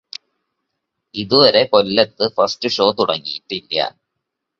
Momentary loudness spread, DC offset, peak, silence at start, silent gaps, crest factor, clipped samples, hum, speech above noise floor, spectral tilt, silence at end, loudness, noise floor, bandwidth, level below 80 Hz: 16 LU; under 0.1%; 0 dBFS; 1.15 s; none; 18 dB; under 0.1%; none; 61 dB; -4.5 dB/octave; 0.7 s; -16 LUFS; -78 dBFS; 7.4 kHz; -58 dBFS